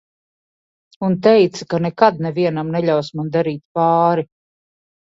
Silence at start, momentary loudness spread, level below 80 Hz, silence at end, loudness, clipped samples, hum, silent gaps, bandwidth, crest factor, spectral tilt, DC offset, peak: 1 s; 9 LU; -62 dBFS; 0.9 s; -17 LUFS; under 0.1%; none; 3.65-3.75 s; 7.8 kHz; 18 dB; -7 dB/octave; under 0.1%; 0 dBFS